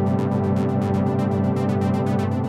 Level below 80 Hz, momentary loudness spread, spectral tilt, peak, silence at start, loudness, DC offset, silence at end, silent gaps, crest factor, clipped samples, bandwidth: -62 dBFS; 0 LU; -9 dB/octave; -10 dBFS; 0 s; -21 LUFS; under 0.1%; 0 s; none; 12 dB; under 0.1%; 11.5 kHz